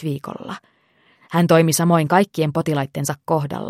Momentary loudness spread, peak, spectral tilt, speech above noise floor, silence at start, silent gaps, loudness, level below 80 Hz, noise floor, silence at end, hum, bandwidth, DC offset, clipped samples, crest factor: 17 LU; -2 dBFS; -5.5 dB/octave; 40 dB; 0 s; none; -19 LUFS; -60 dBFS; -59 dBFS; 0 s; none; 16 kHz; under 0.1%; under 0.1%; 18 dB